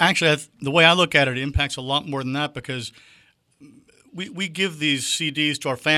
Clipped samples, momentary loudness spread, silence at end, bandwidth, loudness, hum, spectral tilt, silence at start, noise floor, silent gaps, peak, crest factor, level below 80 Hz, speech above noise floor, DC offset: under 0.1%; 16 LU; 0 s; 15.5 kHz; -21 LUFS; none; -3.5 dB/octave; 0 s; -53 dBFS; none; 0 dBFS; 22 dB; -42 dBFS; 31 dB; under 0.1%